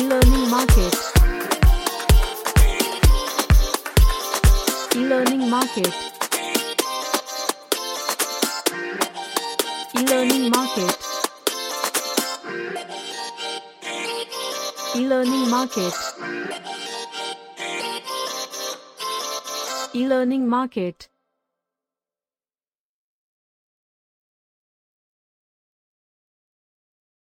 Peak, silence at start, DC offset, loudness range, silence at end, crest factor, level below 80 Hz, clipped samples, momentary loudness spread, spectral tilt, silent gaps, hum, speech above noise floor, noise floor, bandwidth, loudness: -2 dBFS; 0 s; under 0.1%; 8 LU; 6.15 s; 20 dB; -26 dBFS; under 0.1%; 11 LU; -4 dB/octave; none; none; over 68 dB; under -90 dBFS; 17 kHz; -22 LUFS